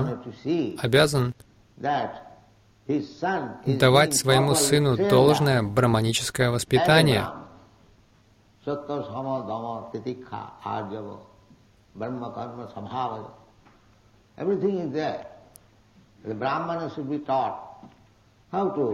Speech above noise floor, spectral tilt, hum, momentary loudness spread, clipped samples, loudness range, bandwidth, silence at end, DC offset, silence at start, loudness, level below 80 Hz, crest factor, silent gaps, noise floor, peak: 35 dB; -5 dB/octave; none; 19 LU; under 0.1%; 14 LU; 16.5 kHz; 0 s; under 0.1%; 0 s; -24 LUFS; -54 dBFS; 20 dB; none; -59 dBFS; -6 dBFS